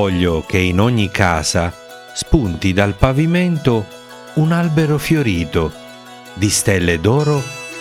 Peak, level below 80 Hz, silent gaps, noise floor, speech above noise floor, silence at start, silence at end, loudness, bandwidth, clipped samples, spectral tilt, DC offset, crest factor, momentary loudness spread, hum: 0 dBFS; -32 dBFS; none; -36 dBFS; 21 dB; 0 s; 0 s; -16 LUFS; 16 kHz; under 0.1%; -5.5 dB/octave; under 0.1%; 16 dB; 13 LU; none